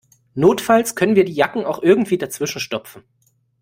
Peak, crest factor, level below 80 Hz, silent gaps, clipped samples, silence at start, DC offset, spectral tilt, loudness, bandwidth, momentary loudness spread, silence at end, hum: 0 dBFS; 18 dB; -58 dBFS; none; under 0.1%; 0.35 s; under 0.1%; -5 dB/octave; -17 LUFS; 16.5 kHz; 10 LU; 0.65 s; none